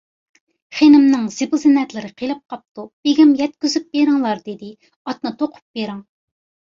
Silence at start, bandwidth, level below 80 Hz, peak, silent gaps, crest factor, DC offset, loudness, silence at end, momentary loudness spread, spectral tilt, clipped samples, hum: 0.7 s; 7.6 kHz; -64 dBFS; -2 dBFS; 2.71-2.75 s, 2.93-3.03 s, 4.96-5.05 s, 5.62-5.74 s; 16 dB; under 0.1%; -17 LUFS; 0.75 s; 21 LU; -4.5 dB/octave; under 0.1%; none